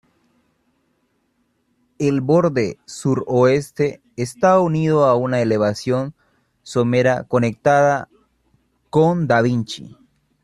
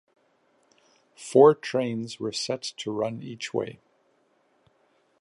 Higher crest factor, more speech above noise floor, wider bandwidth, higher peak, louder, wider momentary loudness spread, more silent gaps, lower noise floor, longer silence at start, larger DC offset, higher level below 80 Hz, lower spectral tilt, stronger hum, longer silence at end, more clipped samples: second, 16 dB vs 24 dB; first, 49 dB vs 43 dB; first, 13 kHz vs 11.5 kHz; about the same, -2 dBFS vs -4 dBFS; first, -18 LUFS vs -25 LUFS; second, 10 LU vs 15 LU; neither; about the same, -67 dBFS vs -67 dBFS; first, 2 s vs 1.2 s; neither; first, -56 dBFS vs -74 dBFS; first, -7 dB/octave vs -5 dB/octave; neither; second, 0.55 s vs 1.5 s; neither